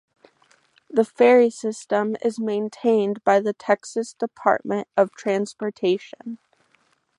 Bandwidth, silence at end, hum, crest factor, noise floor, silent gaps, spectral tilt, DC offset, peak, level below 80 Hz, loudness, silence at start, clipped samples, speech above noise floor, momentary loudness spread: 11 kHz; 0.85 s; none; 20 dB; -65 dBFS; none; -5.5 dB/octave; under 0.1%; -2 dBFS; -74 dBFS; -22 LUFS; 0.95 s; under 0.1%; 43 dB; 12 LU